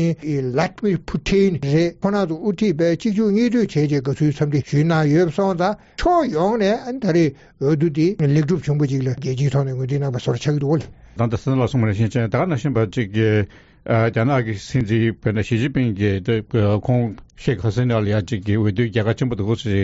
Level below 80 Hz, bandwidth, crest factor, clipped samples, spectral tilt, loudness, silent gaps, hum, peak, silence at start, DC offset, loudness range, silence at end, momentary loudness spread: -44 dBFS; 8 kHz; 12 dB; under 0.1%; -7 dB/octave; -20 LUFS; none; none; -6 dBFS; 0 s; under 0.1%; 2 LU; 0 s; 5 LU